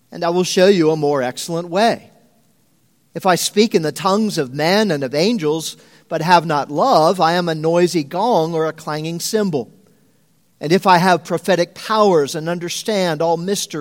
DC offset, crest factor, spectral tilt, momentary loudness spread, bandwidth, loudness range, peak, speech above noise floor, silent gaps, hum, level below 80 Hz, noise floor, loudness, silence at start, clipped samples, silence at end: under 0.1%; 18 dB; -4.5 dB/octave; 10 LU; 17 kHz; 3 LU; 0 dBFS; 43 dB; none; none; -66 dBFS; -60 dBFS; -17 LUFS; 0.1 s; under 0.1%; 0 s